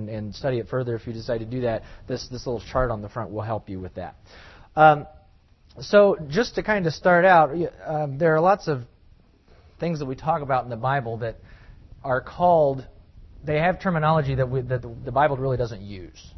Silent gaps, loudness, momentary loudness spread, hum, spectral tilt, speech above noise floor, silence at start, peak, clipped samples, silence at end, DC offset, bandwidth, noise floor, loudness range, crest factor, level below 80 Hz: none; -23 LUFS; 16 LU; none; -7 dB/octave; 32 dB; 0 s; -2 dBFS; under 0.1%; 0.1 s; under 0.1%; 6.2 kHz; -55 dBFS; 9 LU; 22 dB; -46 dBFS